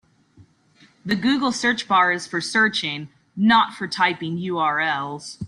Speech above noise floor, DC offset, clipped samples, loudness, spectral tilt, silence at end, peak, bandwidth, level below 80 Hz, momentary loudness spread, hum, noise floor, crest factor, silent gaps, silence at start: 35 dB; under 0.1%; under 0.1%; -21 LUFS; -4 dB/octave; 0 s; -4 dBFS; 11.5 kHz; -62 dBFS; 10 LU; none; -56 dBFS; 18 dB; none; 0.4 s